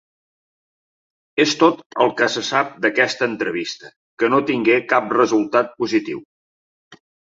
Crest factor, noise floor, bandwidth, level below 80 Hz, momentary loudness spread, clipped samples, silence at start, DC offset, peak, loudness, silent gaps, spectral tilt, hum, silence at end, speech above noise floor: 18 dB; under -90 dBFS; 7.8 kHz; -66 dBFS; 10 LU; under 0.1%; 1.35 s; under 0.1%; -2 dBFS; -18 LUFS; 1.86-1.90 s, 3.96-4.17 s, 6.25-6.91 s; -4 dB/octave; none; 0.4 s; over 72 dB